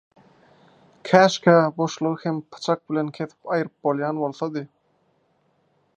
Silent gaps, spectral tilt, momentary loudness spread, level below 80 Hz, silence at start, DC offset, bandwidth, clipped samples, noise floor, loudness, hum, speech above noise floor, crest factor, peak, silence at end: none; -6 dB/octave; 13 LU; -72 dBFS; 1.05 s; under 0.1%; 9.4 kHz; under 0.1%; -66 dBFS; -22 LUFS; none; 44 dB; 22 dB; 0 dBFS; 1.3 s